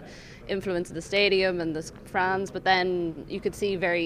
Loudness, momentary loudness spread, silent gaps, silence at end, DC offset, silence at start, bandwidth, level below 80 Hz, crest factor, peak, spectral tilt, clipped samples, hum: -27 LUFS; 11 LU; none; 0 s; under 0.1%; 0 s; 15 kHz; -52 dBFS; 18 dB; -10 dBFS; -4.5 dB/octave; under 0.1%; none